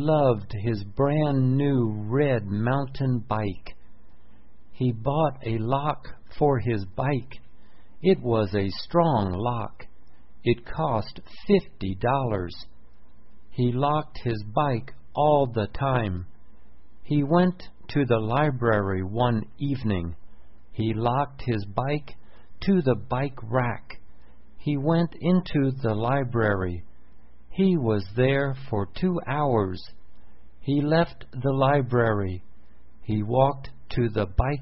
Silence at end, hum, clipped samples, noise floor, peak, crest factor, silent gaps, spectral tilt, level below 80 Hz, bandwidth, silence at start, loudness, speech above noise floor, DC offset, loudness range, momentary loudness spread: 0 s; none; under 0.1%; -54 dBFS; -6 dBFS; 18 dB; none; -11.5 dB/octave; -44 dBFS; 5.8 kHz; 0 s; -25 LUFS; 30 dB; 1%; 3 LU; 10 LU